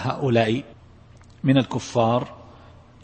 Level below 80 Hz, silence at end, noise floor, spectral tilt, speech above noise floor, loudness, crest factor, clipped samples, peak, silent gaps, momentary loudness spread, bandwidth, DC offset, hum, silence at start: -54 dBFS; 0.6 s; -48 dBFS; -6.5 dB/octave; 27 dB; -22 LUFS; 18 dB; under 0.1%; -6 dBFS; none; 7 LU; 8.8 kHz; under 0.1%; none; 0 s